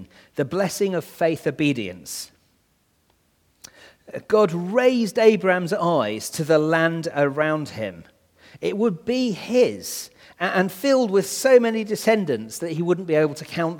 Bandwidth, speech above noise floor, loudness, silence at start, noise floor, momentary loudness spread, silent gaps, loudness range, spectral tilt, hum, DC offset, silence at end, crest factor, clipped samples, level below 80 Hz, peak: 19 kHz; 44 dB; -22 LUFS; 0 s; -65 dBFS; 13 LU; none; 6 LU; -5 dB/octave; none; under 0.1%; 0 s; 20 dB; under 0.1%; -66 dBFS; -2 dBFS